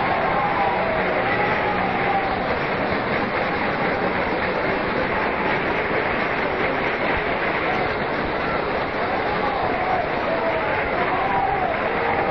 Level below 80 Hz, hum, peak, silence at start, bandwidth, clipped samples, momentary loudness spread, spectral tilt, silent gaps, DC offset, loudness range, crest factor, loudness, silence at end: -42 dBFS; none; -10 dBFS; 0 s; 6.2 kHz; under 0.1%; 2 LU; -7.5 dB/octave; none; 0.3%; 1 LU; 12 dB; -21 LUFS; 0 s